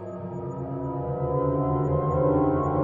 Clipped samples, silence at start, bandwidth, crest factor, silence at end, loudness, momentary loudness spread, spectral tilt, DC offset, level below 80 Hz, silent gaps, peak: under 0.1%; 0 s; 3.3 kHz; 14 dB; 0 s; -26 LUFS; 11 LU; -12 dB/octave; under 0.1%; -46 dBFS; none; -10 dBFS